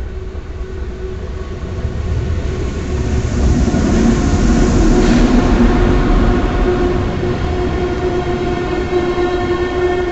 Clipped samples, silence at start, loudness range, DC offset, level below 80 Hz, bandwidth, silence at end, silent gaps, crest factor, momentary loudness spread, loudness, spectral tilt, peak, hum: under 0.1%; 0 s; 6 LU; under 0.1%; -18 dBFS; 8.2 kHz; 0 s; none; 12 dB; 13 LU; -16 LUFS; -7 dB/octave; -2 dBFS; none